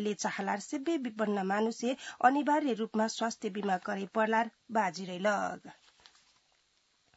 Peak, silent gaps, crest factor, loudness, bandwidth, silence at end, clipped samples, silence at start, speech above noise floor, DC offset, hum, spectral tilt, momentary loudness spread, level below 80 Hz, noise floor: -10 dBFS; none; 22 dB; -32 LUFS; 8 kHz; 1.45 s; under 0.1%; 0 s; 41 dB; under 0.1%; none; -3.5 dB/octave; 6 LU; -84 dBFS; -73 dBFS